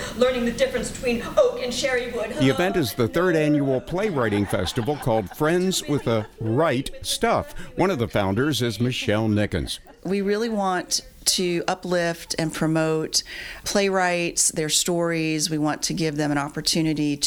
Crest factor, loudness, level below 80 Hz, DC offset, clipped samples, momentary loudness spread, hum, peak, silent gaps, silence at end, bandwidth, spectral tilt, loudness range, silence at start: 18 dB; -23 LUFS; -44 dBFS; under 0.1%; under 0.1%; 5 LU; none; -4 dBFS; none; 0 s; over 20 kHz; -4 dB/octave; 2 LU; 0 s